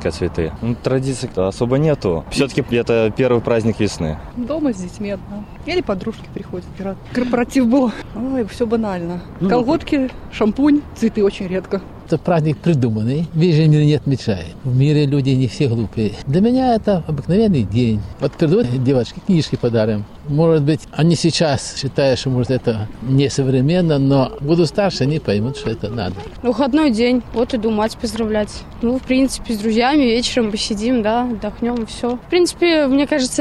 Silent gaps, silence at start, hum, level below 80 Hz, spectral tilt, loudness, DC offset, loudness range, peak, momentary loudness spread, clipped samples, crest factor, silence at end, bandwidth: none; 0 s; none; -38 dBFS; -6.5 dB/octave; -18 LUFS; under 0.1%; 3 LU; -4 dBFS; 9 LU; under 0.1%; 12 dB; 0 s; 12.5 kHz